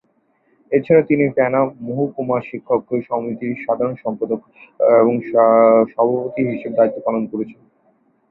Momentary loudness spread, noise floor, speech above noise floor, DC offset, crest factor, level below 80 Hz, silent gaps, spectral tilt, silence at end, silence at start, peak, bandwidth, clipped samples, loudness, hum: 11 LU; -62 dBFS; 45 dB; under 0.1%; 16 dB; -62 dBFS; none; -12 dB/octave; 0.8 s; 0.7 s; -2 dBFS; 4.1 kHz; under 0.1%; -18 LUFS; none